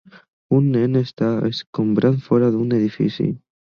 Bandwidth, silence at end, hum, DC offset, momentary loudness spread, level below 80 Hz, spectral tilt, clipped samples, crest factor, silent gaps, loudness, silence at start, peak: 7 kHz; 0.25 s; none; under 0.1%; 6 LU; -56 dBFS; -9 dB/octave; under 0.1%; 16 dB; 1.67-1.73 s; -19 LUFS; 0.5 s; -4 dBFS